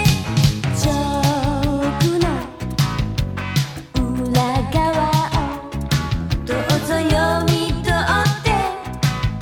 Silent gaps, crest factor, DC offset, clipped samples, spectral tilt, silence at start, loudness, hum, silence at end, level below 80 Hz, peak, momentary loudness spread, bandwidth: none; 16 dB; under 0.1%; under 0.1%; -5.5 dB/octave; 0 s; -19 LUFS; none; 0 s; -30 dBFS; -2 dBFS; 6 LU; 18.5 kHz